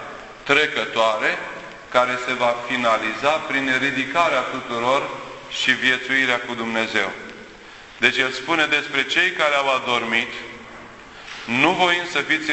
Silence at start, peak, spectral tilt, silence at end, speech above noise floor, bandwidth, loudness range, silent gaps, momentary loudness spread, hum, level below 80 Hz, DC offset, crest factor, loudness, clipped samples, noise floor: 0 s; 0 dBFS; -3 dB/octave; 0 s; 21 dB; 8.4 kHz; 1 LU; none; 18 LU; none; -58 dBFS; under 0.1%; 22 dB; -20 LUFS; under 0.1%; -42 dBFS